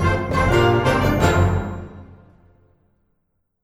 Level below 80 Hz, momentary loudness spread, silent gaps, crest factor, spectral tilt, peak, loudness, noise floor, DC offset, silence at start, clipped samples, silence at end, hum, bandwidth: -32 dBFS; 16 LU; none; 16 dB; -6.5 dB/octave; -4 dBFS; -18 LUFS; -70 dBFS; under 0.1%; 0 s; under 0.1%; 1.5 s; none; 15 kHz